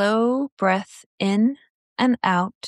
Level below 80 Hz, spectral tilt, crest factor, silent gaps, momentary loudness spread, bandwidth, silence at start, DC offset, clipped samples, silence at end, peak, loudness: -72 dBFS; -6 dB/octave; 16 dB; 0.52-0.57 s, 1.06-1.18 s, 1.70-1.96 s, 2.55-2.61 s; 15 LU; 11.5 kHz; 0 s; under 0.1%; under 0.1%; 0 s; -6 dBFS; -22 LUFS